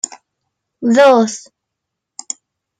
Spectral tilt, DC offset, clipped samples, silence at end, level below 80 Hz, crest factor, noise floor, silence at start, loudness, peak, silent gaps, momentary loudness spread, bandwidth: -3.5 dB/octave; under 0.1%; under 0.1%; 1.4 s; -70 dBFS; 16 dB; -79 dBFS; 0.8 s; -12 LUFS; -2 dBFS; none; 19 LU; 10 kHz